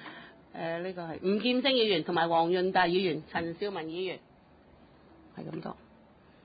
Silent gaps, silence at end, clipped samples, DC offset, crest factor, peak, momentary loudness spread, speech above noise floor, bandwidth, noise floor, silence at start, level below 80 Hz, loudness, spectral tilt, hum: none; 0.7 s; under 0.1%; under 0.1%; 18 dB; -14 dBFS; 19 LU; 29 dB; 5 kHz; -58 dBFS; 0 s; -66 dBFS; -30 LUFS; -9 dB/octave; none